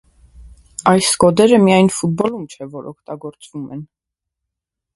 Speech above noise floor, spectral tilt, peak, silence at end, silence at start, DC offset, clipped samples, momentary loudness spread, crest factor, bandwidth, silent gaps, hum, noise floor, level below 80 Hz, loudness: 66 dB; -5 dB/octave; 0 dBFS; 1.1 s; 0.4 s; under 0.1%; under 0.1%; 21 LU; 18 dB; 12 kHz; none; none; -82 dBFS; -50 dBFS; -13 LUFS